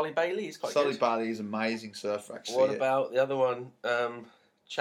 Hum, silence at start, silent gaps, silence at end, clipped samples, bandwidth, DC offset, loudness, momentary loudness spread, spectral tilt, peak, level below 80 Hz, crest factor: none; 0 s; none; 0 s; under 0.1%; 13.5 kHz; under 0.1%; -30 LUFS; 8 LU; -4.5 dB/octave; -12 dBFS; -84 dBFS; 18 dB